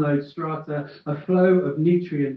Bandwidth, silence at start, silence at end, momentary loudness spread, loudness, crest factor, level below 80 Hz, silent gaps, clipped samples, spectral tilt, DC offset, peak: 5.2 kHz; 0 s; 0 s; 13 LU; -23 LUFS; 14 dB; -68 dBFS; none; under 0.1%; -11 dB/octave; under 0.1%; -8 dBFS